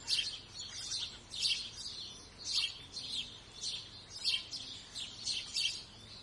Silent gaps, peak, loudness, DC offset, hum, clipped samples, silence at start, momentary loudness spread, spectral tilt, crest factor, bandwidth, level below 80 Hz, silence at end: none; -20 dBFS; -37 LUFS; under 0.1%; none; under 0.1%; 0 s; 11 LU; 0.5 dB/octave; 22 dB; 11.5 kHz; -66 dBFS; 0 s